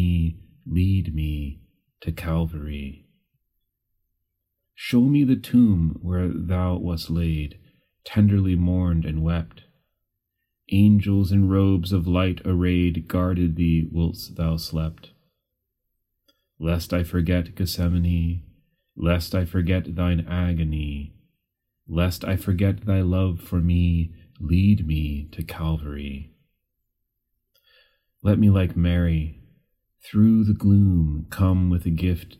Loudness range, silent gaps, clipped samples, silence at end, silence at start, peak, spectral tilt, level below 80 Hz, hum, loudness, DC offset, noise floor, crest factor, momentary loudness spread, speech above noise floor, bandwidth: 7 LU; none; under 0.1%; 0.1 s; 0 s; -6 dBFS; -8 dB/octave; -40 dBFS; none; -23 LUFS; under 0.1%; -79 dBFS; 18 dB; 14 LU; 58 dB; 15 kHz